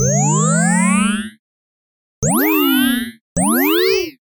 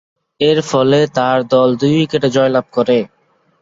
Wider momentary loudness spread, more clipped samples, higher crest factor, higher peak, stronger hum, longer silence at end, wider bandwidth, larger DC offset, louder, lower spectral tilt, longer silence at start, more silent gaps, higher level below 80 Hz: first, 8 LU vs 4 LU; neither; about the same, 12 dB vs 12 dB; about the same, -4 dBFS vs -2 dBFS; neither; second, 0.1 s vs 0.55 s; first, 19.5 kHz vs 7.8 kHz; neither; about the same, -15 LUFS vs -14 LUFS; second, -4 dB/octave vs -6 dB/octave; second, 0 s vs 0.4 s; first, 1.39-2.22 s, 3.21-3.36 s vs none; first, -44 dBFS vs -54 dBFS